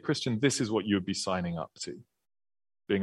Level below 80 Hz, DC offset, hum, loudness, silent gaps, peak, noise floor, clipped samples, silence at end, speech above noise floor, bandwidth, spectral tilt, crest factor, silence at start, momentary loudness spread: -66 dBFS; under 0.1%; none; -31 LUFS; none; -10 dBFS; under -90 dBFS; under 0.1%; 0 s; over 60 dB; 12.5 kHz; -4.5 dB/octave; 22 dB; 0.05 s; 13 LU